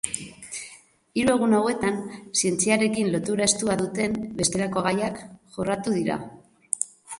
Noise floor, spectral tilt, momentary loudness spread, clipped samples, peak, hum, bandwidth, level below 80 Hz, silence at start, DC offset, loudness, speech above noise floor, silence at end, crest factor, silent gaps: -50 dBFS; -3.5 dB/octave; 14 LU; under 0.1%; -2 dBFS; none; 11.5 kHz; -56 dBFS; 0.05 s; under 0.1%; -24 LUFS; 26 dB; 0.05 s; 24 dB; none